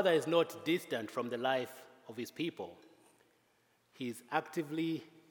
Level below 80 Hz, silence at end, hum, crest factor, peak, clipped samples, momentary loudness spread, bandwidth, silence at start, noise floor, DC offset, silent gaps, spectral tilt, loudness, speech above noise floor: under -90 dBFS; 0.25 s; none; 20 dB; -16 dBFS; under 0.1%; 14 LU; 18 kHz; 0 s; -73 dBFS; under 0.1%; none; -5 dB/octave; -37 LUFS; 38 dB